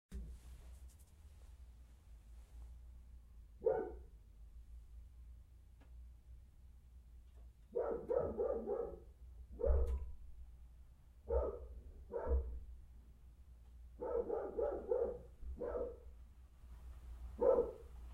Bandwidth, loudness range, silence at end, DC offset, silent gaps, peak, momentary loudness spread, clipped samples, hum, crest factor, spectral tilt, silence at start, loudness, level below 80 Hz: 11 kHz; 16 LU; 0 s; under 0.1%; none; -20 dBFS; 24 LU; under 0.1%; none; 22 dB; -9 dB/octave; 0.1 s; -41 LUFS; -50 dBFS